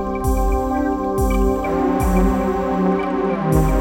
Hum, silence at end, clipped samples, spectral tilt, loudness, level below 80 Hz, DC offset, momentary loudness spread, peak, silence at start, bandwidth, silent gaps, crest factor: none; 0 s; under 0.1%; -7.5 dB/octave; -19 LUFS; -24 dBFS; under 0.1%; 3 LU; -4 dBFS; 0 s; 17 kHz; none; 14 dB